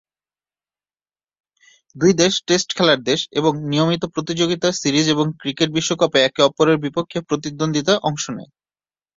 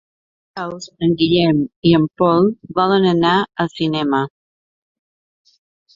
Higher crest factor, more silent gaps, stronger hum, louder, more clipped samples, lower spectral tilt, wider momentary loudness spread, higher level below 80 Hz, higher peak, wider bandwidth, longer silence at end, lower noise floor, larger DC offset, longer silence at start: about the same, 18 dB vs 16 dB; second, none vs 1.76-1.82 s; neither; about the same, -18 LUFS vs -16 LUFS; neither; second, -4 dB/octave vs -7 dB/octave; second, 8 LU vs 14 LU; about the same, -58 dBFS vs -54 dBFS; about the same, 0 dBFS vs -2 dBFS; about the same, 7.8 kHz vs 7.6 kHz; second, 0.75 s vs 1.65 s; about the same, under -90 dBFS vs under -90 dBFS; neither; first, 1.95 s vs 0.55 s